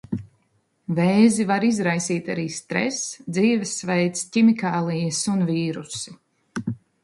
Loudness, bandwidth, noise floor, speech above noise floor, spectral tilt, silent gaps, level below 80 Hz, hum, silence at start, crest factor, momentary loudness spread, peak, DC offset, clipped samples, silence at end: -22 LUFS; 11.5 kHz; -67 dBFS; 46 dB; -5 dB/octave; none; -62 dBFS; none; 0.1 s; 18 dB; 15 LU; -4 dBFS; under 0.1%; under 0.1%; 0.3 s